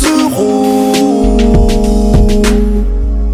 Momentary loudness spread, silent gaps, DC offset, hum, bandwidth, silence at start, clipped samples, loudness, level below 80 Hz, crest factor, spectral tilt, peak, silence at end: 5 LU; none; under 0.1%; none; 15.5 kHz; 0 s; under 0.1%; -10 LUFS; -12 dBFS; 8 dB; -6 dB/octave; 0 dBFS; 0 s